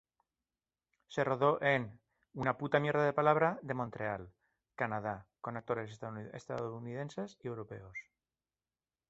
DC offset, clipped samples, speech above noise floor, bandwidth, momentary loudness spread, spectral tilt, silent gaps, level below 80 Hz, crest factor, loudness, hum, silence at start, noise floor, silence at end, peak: under 0.1%; under 0.1%; over 55 dB; 8 kHz; 16 LU; -5 dB/octave; none; -70 dBFS; 24 dB; -35 LUFS; none; 1.1 s; under -90 dBFS; 1.1 s; -12 dBFS